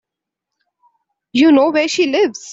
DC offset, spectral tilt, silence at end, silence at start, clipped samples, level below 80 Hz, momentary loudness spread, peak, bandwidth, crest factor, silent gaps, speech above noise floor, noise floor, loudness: under 0.1%; -3 dB/octave; 0 s; 1.35 s; under 0.1%; -62 dBFS; 6 LU; -2 dBFS; 7.8 kHz; 14 dB; none; 69 dB; -82 dBFS; -14 LUFS